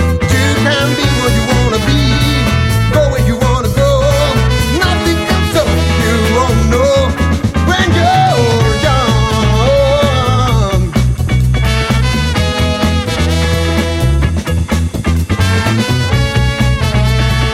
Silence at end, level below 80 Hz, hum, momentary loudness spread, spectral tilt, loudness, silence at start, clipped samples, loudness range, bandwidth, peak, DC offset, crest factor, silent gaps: 0 s; -18 dBFS; none; 3 LU; -5.5 dB/octave; -12 LUFS; 0 s; under 0.1%; 2 LU; 16 kHz; 0 dBFS; under 0.1%; 10 dB; none